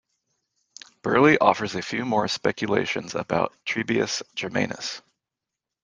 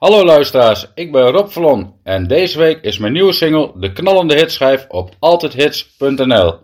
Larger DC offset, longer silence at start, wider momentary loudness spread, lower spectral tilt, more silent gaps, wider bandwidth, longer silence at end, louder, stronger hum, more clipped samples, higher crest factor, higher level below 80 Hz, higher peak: neither; first, 1.05 s vs 0 s; about the same, 11 LU vs 9 LU; about the same, -4.5 dB/octave vs -5.5 dB/octave; neither; second, 10 kHz vs 16 kHz; first, 0.85 s vs 0.1 s; second, -24 LUFS vs -12 LUFS; neither; second, under 0.1% vs 0.5%; first, 22 dB vs 12 dB; second, -62 dBFS vs -44 dBFS; about the same, -2 dBFS vs 0 dBFS